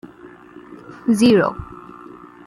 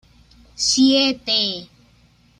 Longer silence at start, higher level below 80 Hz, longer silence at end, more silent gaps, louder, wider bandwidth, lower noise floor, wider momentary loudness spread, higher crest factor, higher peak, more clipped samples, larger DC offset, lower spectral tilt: second, 0.25 s vs 0.6 s; about the same, -50 dBFS vs -54 dBFS; about the same, 0.7 s vs 0.75 s; neither; about the same, -17 LUFS vs -17 LUFS; first, 13 kHz vs 10.5 kHz; second, -43 dBFS vs -55 dBFS; first, 26 LU vs 9 LU; about the same, 18 dB vs 18 dB; about the same, -4 dBFS vs -4 dBFS; neither; neither; first, -6 dB/octave vs -2 dB/octave